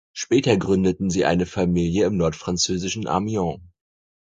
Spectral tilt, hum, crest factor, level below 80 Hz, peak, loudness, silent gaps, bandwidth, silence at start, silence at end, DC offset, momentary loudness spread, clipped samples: -5 dB/octave; none; 20 dB; -42 dBFS; -2 dBFS; -22 LUFS; none; 9.4 kHz; 0.15 s; 0.6 s; under 0.1%; 6 LU; under 0.1%